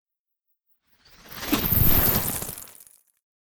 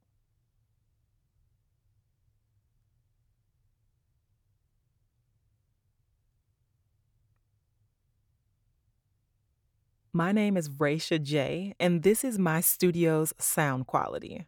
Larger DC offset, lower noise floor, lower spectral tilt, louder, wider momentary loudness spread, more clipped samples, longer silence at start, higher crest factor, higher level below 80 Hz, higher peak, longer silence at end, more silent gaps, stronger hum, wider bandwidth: neither; about the same, -77 dBFS vs -75 dBFS; about the same, -4 dB/octave vs -5 dB/octave; first, -21 LUFS vs -27 LUFS; first, 22 LU vs 6 LU; neither; second, 0.05 s vs 10.15 s; about the same, 22 dB vs 22 dB; first, -36 dBFS vs -68 dBFS; first, -4 dBFS vs -12 dBFS; about the same, 0.15 s vs 0.05 s; first, 0.19-0.25 s vs none; neither; about the same, over 20 kHz vs over 20 kHz